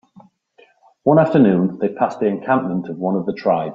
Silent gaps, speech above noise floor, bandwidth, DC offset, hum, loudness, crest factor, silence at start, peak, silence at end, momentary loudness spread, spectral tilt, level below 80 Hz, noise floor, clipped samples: none; 37 dB; 7.6 kHz; under 0.1%; none; -18 LUFS; 16 dB; 1.05 s; -2 dBFS; 0 s; 8 LU; -9.5 dB/octave; -60 dBFS; -54 dBFS; under 0.1%